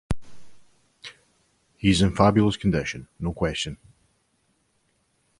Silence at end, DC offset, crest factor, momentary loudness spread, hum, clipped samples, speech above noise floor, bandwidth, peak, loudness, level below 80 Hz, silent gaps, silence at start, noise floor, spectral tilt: 1.65 s; under 0.1%; 22 dB; 24 LU; none; under 0.1%; 47 dB; 11.5 kHz; -4 dBFS; -24 LUFS; -42 dBFS; none; 0.1 s; -69 dBFS; -6 dB/octave